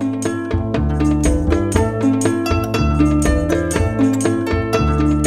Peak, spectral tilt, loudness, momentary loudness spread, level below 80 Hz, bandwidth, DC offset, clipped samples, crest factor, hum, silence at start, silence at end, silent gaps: 0 dBFS; -6.5 dB/octave; -17 LUFS; 4 LU; -24 dBFS; 15 kHz; 0.3%; under 0.1%; 16 dB; none; 0 s; 0 s; none